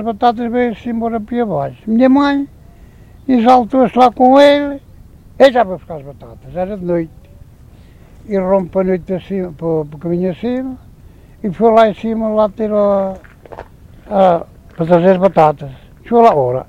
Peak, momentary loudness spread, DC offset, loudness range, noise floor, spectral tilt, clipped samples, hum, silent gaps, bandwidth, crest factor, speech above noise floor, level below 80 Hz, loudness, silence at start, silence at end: 0 dBFS; 18 LU; under 0.1%; 8 LU; -40 dBFS; -7.5 dB/octave; 0.2%; none; none; 11 kHz; 14 dB; 27 dB; -42 dBFS; -13 LUFS; 0 s; 0.05 s